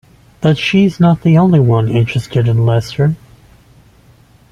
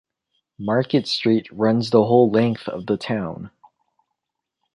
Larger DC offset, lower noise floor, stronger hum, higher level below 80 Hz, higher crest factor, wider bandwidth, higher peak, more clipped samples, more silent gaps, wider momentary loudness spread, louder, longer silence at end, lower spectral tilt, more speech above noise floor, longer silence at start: neither; second, -46 dBFS vs -82 dBFS; neither; first, -44 dBFS vs -60 dBFS; second, 12 dB vs 20 dB; about the same, 11 kHz vs 11 kHz; about the same, -2 dBFS vs -2 dBFS; neither; neither; second, 7 LU vs 15 LU; first, -12 LUFS vs -20 LUFS; about the same, 1.35 s vs 1.25 s; about the same, -8 dB/octave vs -7 dB/octave; second, 35 dB vs 63 dB; second, 0.4 s vs 0.6 s